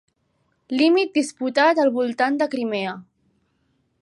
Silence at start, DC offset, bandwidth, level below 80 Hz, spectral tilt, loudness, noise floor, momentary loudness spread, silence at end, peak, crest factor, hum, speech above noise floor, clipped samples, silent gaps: 0.7 s; under 0.1%; 11.5 kHz; -76 dBFS; -4 dB/octave; -21 LUFS; -69 dBFS; 10 LU; 1 s; -4 dBFS; 18 dB; none; 49 dB; under 0.1%; none